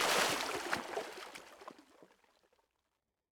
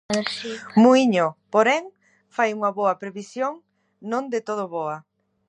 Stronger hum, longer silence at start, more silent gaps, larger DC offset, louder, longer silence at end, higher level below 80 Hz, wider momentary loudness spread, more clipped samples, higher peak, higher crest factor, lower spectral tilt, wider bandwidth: neither; about the same, 0 s vs 0.1 s; neither; neither; second, -36 LUFS vs -22 LUFS; first, 1.3 s vs 0.5 s; second, -74 dBFS vs -68 dBFS; first, 23 LU vs 15 LU; neither; second, -18 dBFS vs -4 dBFS; about the same, 22 dB vs 18 dB; second, -1 dB/octave vs -5 dB/octave; first, over 20 kHz vs 10.5 kHz